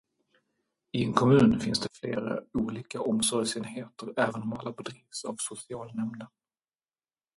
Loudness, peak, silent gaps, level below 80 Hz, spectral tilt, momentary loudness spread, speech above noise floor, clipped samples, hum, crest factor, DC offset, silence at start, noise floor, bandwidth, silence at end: -29 LUFS; -6 dBFS; none; -60 dBFS; -5 dB/octave; 17 LU; over 61 dB; under 0.1%; none; 26 dB; under 0.1%; 0.95 s; under -90 dBFS; 11.5 kHz; 1.1 s